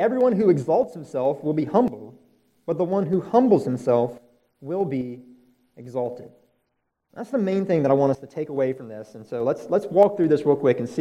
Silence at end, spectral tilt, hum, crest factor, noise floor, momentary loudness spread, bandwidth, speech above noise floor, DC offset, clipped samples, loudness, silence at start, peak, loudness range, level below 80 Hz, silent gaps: 0 s; -8.5 dB/octave; none; 18 dB; -75 dBFS; 16 LU; 11.5 kHz; 53 dB; under 0.1%; under 0.1%; -22 LUFS; 0 s; -4 dBFS; 7 LU; -68 dBFS; none